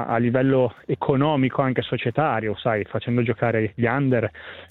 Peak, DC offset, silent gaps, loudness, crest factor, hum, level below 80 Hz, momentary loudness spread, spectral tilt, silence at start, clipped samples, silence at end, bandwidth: -6 dBFS; under 0.1%; none; -22 LUFS; 16 dB; none; -56 dBFS; 5 LU; -10 dB/octave; 0 s; under 0.1%; 0.05 s; 4.2 kHz